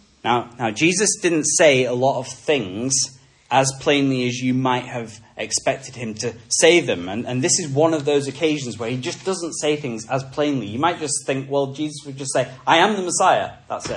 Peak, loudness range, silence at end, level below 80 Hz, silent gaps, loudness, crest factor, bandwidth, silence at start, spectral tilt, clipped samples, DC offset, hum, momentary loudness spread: 0 dBFS; 5 LU; 0 s; -60 dBFS; none; -20 LUFS; 20 dB; 11.5 kHz; 0.25 s; -3.5 dB/octave; under 0.1%; under 0.1%; none; 11 LU